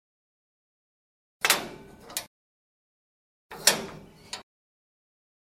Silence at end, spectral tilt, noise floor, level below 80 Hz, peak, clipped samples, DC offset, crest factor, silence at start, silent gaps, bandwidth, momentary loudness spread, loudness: 1 s; 0 dB/octave; under -90 dBFS; -66 dBFS; -2 dBFS; under 0.1%; under 0.1%; 32 dB; 1.4 s; 2.27-3.49 s; 16 kHz; 23 LU; -26 LUFS